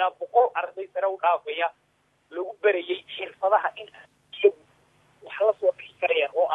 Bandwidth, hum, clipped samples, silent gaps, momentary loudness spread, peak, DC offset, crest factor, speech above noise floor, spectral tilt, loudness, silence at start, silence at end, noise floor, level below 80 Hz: 4 kHz; none; under 0.1%; none; 13 LU; -6 dBFS; under 0.1%; 20 dB; 37 dB; -4.5 dB/octave; -25 LUFS; 0 s; 0 s; -62 dBFS; -80 dBFS